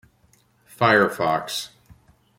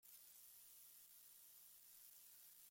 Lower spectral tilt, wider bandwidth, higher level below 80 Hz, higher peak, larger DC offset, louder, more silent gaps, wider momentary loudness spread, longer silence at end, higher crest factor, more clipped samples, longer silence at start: first, -4.5 dB/octave vs 1.5 dB/octave; about the same, 16.5 kHz vs 16.5 kHz; first, -62 dBFS vs under -90 dBFS; first, -2 dBFS vs -50 dBFS; neither; first, -21 LUFS vs -62 LUFS; neither; first, 13 LU vs 1 LU; first, 0.7 s vs 0 s; first, 22 dB vs 16 dB; neither; first, 0.8 s vs 0 s